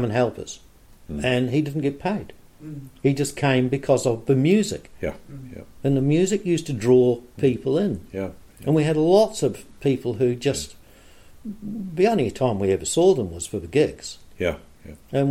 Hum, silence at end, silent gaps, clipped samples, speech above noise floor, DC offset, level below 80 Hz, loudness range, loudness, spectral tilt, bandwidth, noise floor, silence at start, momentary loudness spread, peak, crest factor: none; 0 s; none; under 0.1%; 26 dB; under 0.1%; -48 dBFS; 3 LU; -22 LUFS; -6 dB/octave; 15 kHz; -48 dBFS; 0 s; 18 LU; -4 dBFS; 18 dB